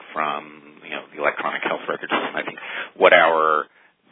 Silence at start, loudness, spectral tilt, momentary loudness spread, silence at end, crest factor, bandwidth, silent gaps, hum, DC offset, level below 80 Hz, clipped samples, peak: 0.05 s; -20 LUFS; -7 dB/octave; 18 LU; 0.5 s; 22 dB; 4 kHz; none; none; under 0.1%; -68 dBFS; under 0.1%; 0 dBFS